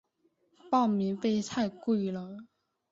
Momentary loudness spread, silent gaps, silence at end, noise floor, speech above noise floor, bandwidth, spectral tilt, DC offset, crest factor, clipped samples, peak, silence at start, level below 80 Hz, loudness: 13 LU; none; 0.45 s; -73 dBFS; 43 dB; 7.8 kHz; -6 dB/octave; under 0.1%; 18 dB; under 0.1%; -14 dBFS; 0.65 s; -70 dBFS; -30 LUFS